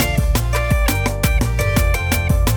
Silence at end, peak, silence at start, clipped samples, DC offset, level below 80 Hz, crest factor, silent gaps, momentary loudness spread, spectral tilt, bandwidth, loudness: 0 s; -4 dBFS; 0 s; under 0.1%; under 0.1%; -20 dBFS; 12 dB; none; 1 LU; -5 dB/octave; 20 kHz; -18 LUFS